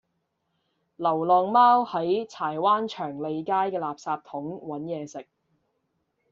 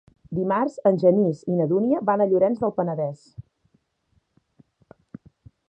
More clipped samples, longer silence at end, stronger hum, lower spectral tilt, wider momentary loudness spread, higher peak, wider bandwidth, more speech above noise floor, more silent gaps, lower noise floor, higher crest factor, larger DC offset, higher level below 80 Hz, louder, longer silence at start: neither; second, 1.1 s vs 2.3 s; neither; second, -4 dB/octave vs -9.5 dB/octave; first, 16 LU vs 10 LU; about the same, -8 dBFS vs -6 dBFS; second, 7.6 kHz vs 8.4 kHz; first, 52 dB vs 47 dB; neither; first, -77 dBFS vs -68 dBFS; about the same, 18 dB vs 18 dB; neither; second, -74 dBFS vs -62 dBFS; second, -25 LUFS vs -22 LUFS; first, 1 s vs 0.3 s